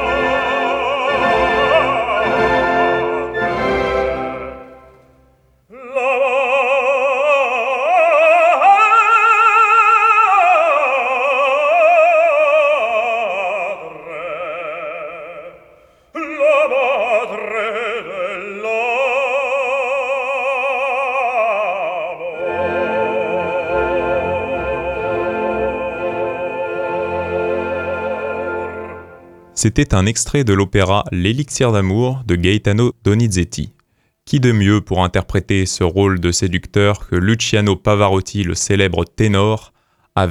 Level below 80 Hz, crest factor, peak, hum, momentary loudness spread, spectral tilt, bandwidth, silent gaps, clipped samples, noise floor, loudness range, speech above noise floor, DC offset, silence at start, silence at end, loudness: -38 dBFS; 16 dB; 0 dBFS; none; 13 LU; -5 dB/octave; 13 kHz; none; under 0.1%; -62 dBFS; 9 LU; 47 dB; under 0.1%; 0 s; 0 s; -15 LUFS